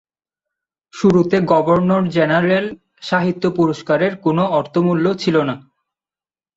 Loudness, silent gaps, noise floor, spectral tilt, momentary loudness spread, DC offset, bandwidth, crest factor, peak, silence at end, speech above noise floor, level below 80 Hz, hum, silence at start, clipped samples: -16 LUFS; none; under -90 dBFS; -7.5 dB/octave; 5 LU; under 0.1%; 7.8 kHz; 16 dB; -2 dBFS; 0.95 s; over 74 dB; -54 dBFS; none; 0.95 s; under 0.1%